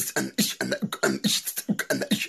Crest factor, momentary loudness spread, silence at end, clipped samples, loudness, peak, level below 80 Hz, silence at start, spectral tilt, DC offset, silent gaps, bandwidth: 18 dB; 5 LU; 0 s; under 0.1%; -26 LUFS; -8 dBFS; -66 dBFS; 0 s; -3 dB/octave; under 0.1%; none; 14 kHz